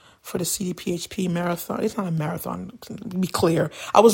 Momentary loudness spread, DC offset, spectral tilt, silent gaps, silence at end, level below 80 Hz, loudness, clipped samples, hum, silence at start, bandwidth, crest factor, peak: 11 LU; under 0.1%; -5 dB/octave; none; 0 s; -56 dBFS; -25 LUFS; under 0.1%; none; 0.25 s; 17 kHz; 22 dB; 0 dBFS